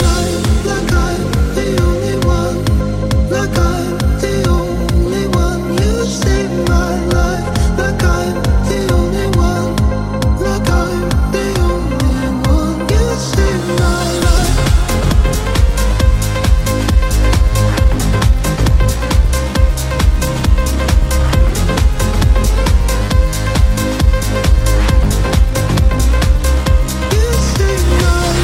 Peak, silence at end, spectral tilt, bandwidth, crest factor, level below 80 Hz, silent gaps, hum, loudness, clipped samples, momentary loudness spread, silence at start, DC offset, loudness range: 0 dBFS; 0 s; -5.5 dB/octave; 16.5 kHz; 12 dB; -14 dBFS; none; none; -14 LUFS; under 0.1%; 2 LU; 0 s; under 0.1%; 1 LU